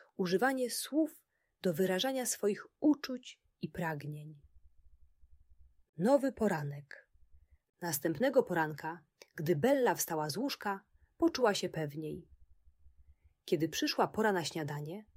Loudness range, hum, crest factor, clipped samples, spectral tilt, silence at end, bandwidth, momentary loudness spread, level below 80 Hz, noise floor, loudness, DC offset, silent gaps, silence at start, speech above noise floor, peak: 4 LU; none; 18 dB; under 0.1%; -4.5 dB/octave; 0.15 s; 16 kHz; 15 LU; -68 dBFS; -64 dBFS; -34 LUFS; under 0.1%; 5.89-5.93 s; 0.2 s; 31 dB; -16 dBFS